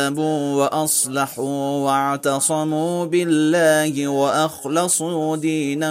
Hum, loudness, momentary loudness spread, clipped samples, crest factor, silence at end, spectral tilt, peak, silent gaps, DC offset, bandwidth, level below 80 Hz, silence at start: none; -19 LUFS; 5 LU; under 0.1%; 14 dB; 0 s; -4 dB/octave; -4 dBFS; none; under 0.1%; 16 kHz; -68 dBFS; 0 s